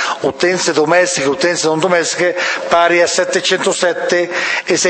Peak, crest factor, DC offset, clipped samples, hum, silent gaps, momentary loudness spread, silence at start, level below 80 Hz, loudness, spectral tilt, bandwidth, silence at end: 0 dBFS; 14 dB; under 0.1%; under 0.1%; none; none; 4 LU; 0 s; -58 dBFS; -13 LUFS; -2.5 dB/octave; 8.8 kHz; 0 s